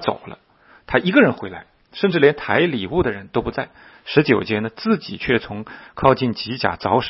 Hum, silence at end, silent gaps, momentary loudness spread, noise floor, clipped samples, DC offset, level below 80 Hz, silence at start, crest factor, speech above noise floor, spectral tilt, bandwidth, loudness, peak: none; 0 s; none; 17 LU; -52 dBFS; under 0.1%; under 0.1%; -46 dBFS; 0 s; 20 dB; 33 dB; -9.5 dB/octave; 5.8 kHz; -19 LUFS; 0 dBFS